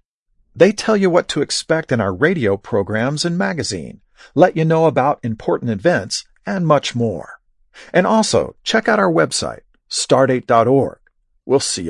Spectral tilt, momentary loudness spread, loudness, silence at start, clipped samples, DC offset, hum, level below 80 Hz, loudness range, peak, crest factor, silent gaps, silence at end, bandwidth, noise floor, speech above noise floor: -5 dB/octave; 10 LU; -17 LUFS; 0.55 s; under 0.1%; under 0.1%; none; -54 dBFS; 2 LU; 0 dBFS; 18 dB; none; 0 s; 11.5 kHz; -62 dBFS; 46 dB